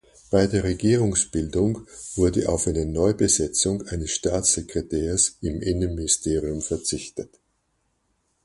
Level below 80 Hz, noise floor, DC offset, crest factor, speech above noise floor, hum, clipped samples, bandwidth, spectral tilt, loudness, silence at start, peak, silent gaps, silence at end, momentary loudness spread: -38 dBFS; -71 dBFS; under 0.1%; 18 dB; 48 dB; none; under 0.1%; 11.5 kHz; -4.5 dB/octave; -23 LUFS; 0.3 s; -6 dBFS; none; 1.2 s; 8 LU